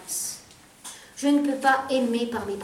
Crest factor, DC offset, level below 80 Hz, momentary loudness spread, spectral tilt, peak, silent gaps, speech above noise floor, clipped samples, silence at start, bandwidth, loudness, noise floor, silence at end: 18 dB; under 0.1%; -66 dBFS; 19 LU; -2.5 dB/octave; -8 dBFS; none; 26 dB; under 0.1%; 0 s; 16 kHz; -24 LUFS; -49 dBFS; 0 s